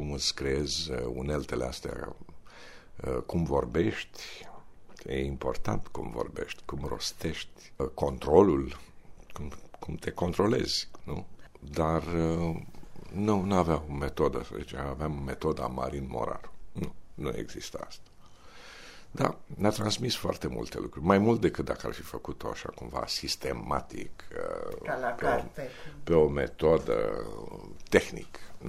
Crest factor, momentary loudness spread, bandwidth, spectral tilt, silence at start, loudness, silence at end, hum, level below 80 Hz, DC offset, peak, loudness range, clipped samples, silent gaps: 26 dB; 18 LU; 16 kHz; -5.5 dB/octave; 0 s; -31 LUFS; 0 s; none; -46 dBFS; under 0.1%; -4 dBFS; 6 LU; under 0.1%; none